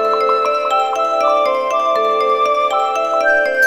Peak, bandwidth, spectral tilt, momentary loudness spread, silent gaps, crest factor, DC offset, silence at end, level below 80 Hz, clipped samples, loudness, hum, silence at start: -2 dBFS; 16.5 kHz; -1.5 dB/octave; 2 LU; none; 12 dB; 0.3%; 0 s; -60 dBFS; under 0.1%; -15 LUFS; none; 0 s